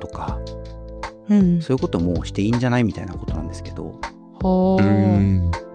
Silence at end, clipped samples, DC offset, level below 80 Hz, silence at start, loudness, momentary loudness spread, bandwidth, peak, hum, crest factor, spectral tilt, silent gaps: 0 s; under 0.1%; under 0.1%; -34 dBFS; 0 s; -20 LUFS; 17 LU; 9.4 kHz; -6 dBFS; none; 14 dB; -8 dB/octave; none